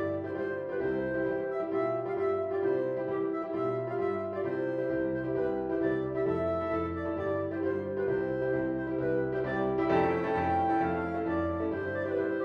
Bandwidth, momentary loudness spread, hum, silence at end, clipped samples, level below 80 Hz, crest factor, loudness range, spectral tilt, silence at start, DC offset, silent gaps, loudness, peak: 5.6 kHz; 4 LU; none; 0 s; under 0.1%; -56 dBFS; 16 dB; 2 LU; -9 dB/octave; 0 s; under 0.1%; none; -31 LUFS; -16 dBFS